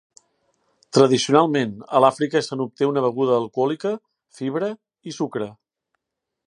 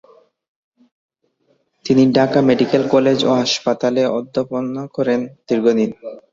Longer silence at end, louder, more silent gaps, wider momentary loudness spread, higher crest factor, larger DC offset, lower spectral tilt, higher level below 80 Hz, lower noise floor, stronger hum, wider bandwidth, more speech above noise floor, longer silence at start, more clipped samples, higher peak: first, 0.95 s vs 0.15 s; second, -21 LUFS vs -17 LUFS; neither; first, 14 LU vs 9 LU; first, 22 dB vs 16 dB; neither; about the same, -5.5 dB/octave vs -5.5 dB/octave; second, -70 dBFS vs -58 dBFS; first, -83 dBFS vs -63 dBFS; neither; first, 11 kHz vs 7.6 kHz; first, 63 dB vs 47 dB; second, 0.95 s vs 1.85 s; neither; about the same, 0 dBFS vs -2 dBFS